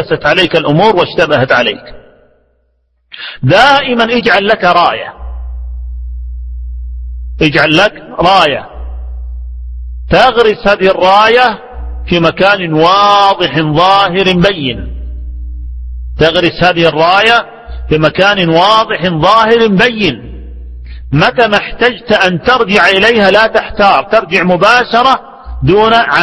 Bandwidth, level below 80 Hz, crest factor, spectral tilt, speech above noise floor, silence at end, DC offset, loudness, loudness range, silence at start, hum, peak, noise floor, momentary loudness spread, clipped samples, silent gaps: 11 kHz; -26 dBFS; 10 dB; -5.5 dB/octave; 49 dB; 0 s; 0.1%; -8 LUFS; 4 LU; 0 s; none; 0 dBFS; -57 dBFS; 18 LU; 0.8%; none